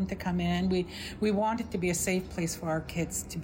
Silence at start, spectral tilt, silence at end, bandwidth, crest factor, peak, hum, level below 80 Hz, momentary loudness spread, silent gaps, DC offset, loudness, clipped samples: 0 s; -5 dB/octave; 0 s; 16.5 kHz; 12 dB; -18 dBFS; none; -48 dBFS; 5 LU; none; under 0.1%; -31 LUFS; under 0.1%